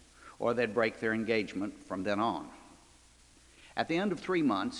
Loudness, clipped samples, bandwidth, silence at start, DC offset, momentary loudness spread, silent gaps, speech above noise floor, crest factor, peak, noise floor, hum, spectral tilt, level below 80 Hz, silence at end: -33 LUFS; under 0.1%; 11.5 kHz; 0.2 s; under 0.1%; 9 LU; none; 29 dB; 20 dB; -14 dBFS; -60 dBFS; none; -5.5 dB/octave; -66 dBFS; 0 s